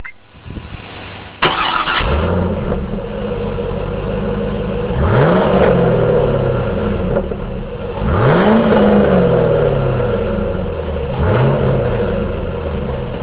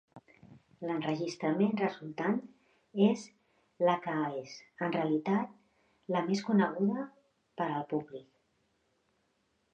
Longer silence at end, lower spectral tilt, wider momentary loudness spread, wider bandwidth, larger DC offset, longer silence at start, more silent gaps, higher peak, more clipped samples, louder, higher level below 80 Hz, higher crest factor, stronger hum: second, 0 s vs 1.5 s; first, -11 dB/octave vs -7 dB/octave; about the same, 13 LU vs 14 LU; second, 4 kHz vs 8.4 kHz; neither; second, 0 s vs 0.15 s; neither; first, 0 dBFS vs -14 dBFS; neither; first, -16 LUFS vs -33 LUFS; first, -26 dBFS vs -80 dBFS; about the same, 16 dB vs 20 dB; neither